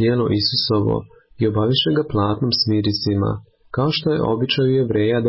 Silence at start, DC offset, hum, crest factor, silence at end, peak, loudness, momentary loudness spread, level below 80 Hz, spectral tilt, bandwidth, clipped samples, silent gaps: 0 s; under 0.1%; none; 12 dB; 0 s; -6 dBFS; -19 LUFS; 5 LU; -44 dBFS; -9.5 dB/octave; 5.8 kHz; under 0.1%; none